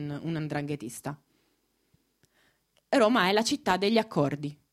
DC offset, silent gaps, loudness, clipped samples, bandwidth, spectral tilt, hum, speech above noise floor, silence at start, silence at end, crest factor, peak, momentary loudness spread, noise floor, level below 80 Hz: under 0.1%; none; -27 LUFS; under 0.1%; 15.5 kHz; -5 dB/octave; none; 45 dB; 0 s; 0.2 s; 20 dB; -8 dBFS; 15 LU; -73 dBFS; -66 dBFS